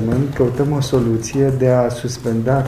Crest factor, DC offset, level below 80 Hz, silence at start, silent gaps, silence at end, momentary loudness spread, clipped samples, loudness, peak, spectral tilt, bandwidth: 14 dB; under 0.1%; -38 dBFS; 0 s; none; 0 s; 5 LU; under 0.1%; -17 LUFS; -2 dBFS; -7 dB/octave; 14 kHz